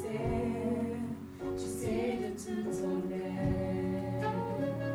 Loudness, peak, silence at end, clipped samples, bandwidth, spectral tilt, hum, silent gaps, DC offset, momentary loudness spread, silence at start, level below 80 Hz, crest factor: -35 LUFS; -20 dBFS; 0 s; under 0.1%; over 20 kHz; -7 dB/octave; none; none; under 0.1%; 4 LU; 0 s; -52 dBFS; 14 dB